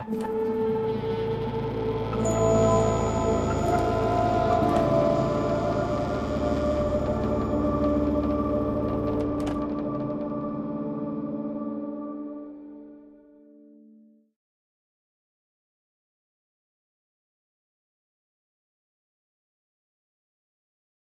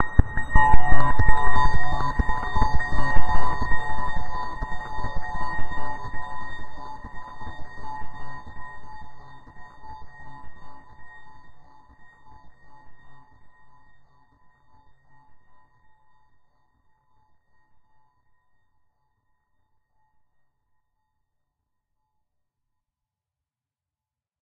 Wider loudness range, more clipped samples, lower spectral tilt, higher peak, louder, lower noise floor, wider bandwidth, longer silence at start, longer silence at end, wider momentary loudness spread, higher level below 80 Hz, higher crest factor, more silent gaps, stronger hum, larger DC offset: second, 12 LU vs 24 LU; neither; about the same, -7 dB/octave vs -6.5 dB/octave; second, -10 dBFS vs 0 dBFS; about the same, -26 LUFS vs -27 LUFS; second, -56 dBFS vs under -90 dBFS; first, 14 kHz vs 6.6 kHz; about the same, 0 s vs 0 s; second, 7.9 s vs 11.3 s; second, 10 LU vs 25 LU; second, -42 dBFS vs -32 dBFS; about the same, 18 dB vs 18 dB; neither; neither; neither